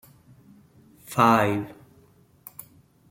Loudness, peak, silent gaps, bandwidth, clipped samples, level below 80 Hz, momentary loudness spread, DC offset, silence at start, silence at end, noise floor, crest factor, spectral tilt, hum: -22 LUFS; -4 dBFS; none; 16.5 kHz; under 0.1%; -66 dBFS; 24 LU; under 0.1%; 1.1 s; 1.4 s; -57 dBFS; 24 dB; -6 dB/octave; none